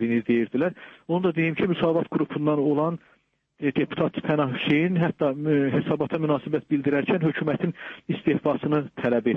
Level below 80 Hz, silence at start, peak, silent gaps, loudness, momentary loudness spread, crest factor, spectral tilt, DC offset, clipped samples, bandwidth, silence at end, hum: -62 dBFS; 0 s; -10 dBFS; none; -25 LUFS; 6 LU; 14 dB; -9.5 dB/octave; under 0.1%; under 0.1%; 4.3 kHz; 0 s; none